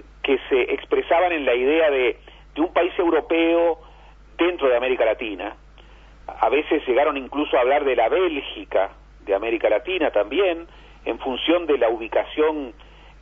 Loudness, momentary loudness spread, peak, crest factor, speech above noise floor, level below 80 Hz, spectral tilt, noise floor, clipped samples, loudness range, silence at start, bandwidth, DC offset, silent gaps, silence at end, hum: -21 LUFS; 12 LU; -4 dBFS; 18 dB; 26 dB; -48 dBFS; -6.5 dB/octave; -46 dBFS; under 0.1%; 3 LU; 0.25 s; 3.8 kHz; under 0.1%; none; 0.5 s; none